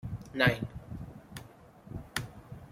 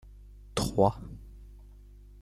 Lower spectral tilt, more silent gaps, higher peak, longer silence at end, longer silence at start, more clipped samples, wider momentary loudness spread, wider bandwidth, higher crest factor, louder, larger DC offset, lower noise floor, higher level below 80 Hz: about the same, -5 dB/octave vs -6 dB/octave; neither; about the same, -8 dBFS vs -10 dBFS; second, 0 s vs 0.6 s; about the same, 0.05 s vs 0.05 s; neither; second, 21 LU vs 25 LU; about the same, 16.5 kHz vs 15 kHz; about the same, 28 dB vs 24 dB; second, -32 LUFS vs -29 LUFS; neither; about the same, -53 dBFS vs -51 dBFS; second, -54 dBFS vs -48 dBFS